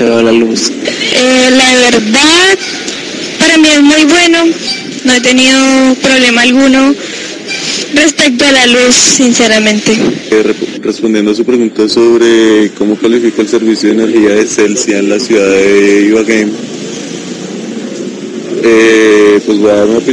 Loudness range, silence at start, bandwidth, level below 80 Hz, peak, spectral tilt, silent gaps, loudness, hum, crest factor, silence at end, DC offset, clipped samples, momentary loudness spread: 4 LU; 0 s; 10.5 kHz; -46 dBFS; 0 dBFS; -2.5 dB/octave; none; -7 LUFS; none; 8 dB; 0 s; under 0.1%; 0.2%; 13 LU